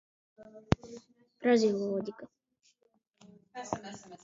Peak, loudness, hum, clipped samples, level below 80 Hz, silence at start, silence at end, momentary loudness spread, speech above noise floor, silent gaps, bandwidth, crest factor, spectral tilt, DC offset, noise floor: -6 dBFS; -32 LUFS; none; under 0.1%; -54 dBFS; 0.4 s; 0.1 s; 25 LU; 42 dB; none; 7.8 kHz; 30 dB; -6 dB/octave; under 0.1%; -74 dBFS